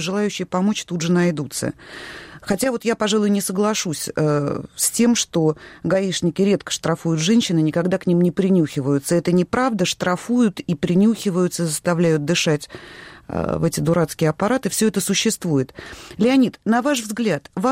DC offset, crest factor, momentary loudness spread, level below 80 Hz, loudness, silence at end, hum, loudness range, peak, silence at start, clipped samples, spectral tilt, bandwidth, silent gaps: under 0.1%; 14 dB; 9 LU; -52 dBFS; -20 LUFS; 0 s; none; 2 LU; -6 dBFS; 0 s; under 0.1%; -5 dB/octave; 16 kHz; none